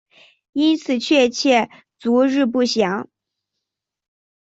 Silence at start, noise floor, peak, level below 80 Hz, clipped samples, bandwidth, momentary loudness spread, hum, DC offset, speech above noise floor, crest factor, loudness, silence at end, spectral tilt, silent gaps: 0.55 s; -82 dBFS; -4 dBFS; -66 dBFS; under 0.1%; 8 kHz; 12 LU; none; under 0.1%; 65 dB; 18 dB; -18 LUFS; 1.55 s; -4 dB/octave; none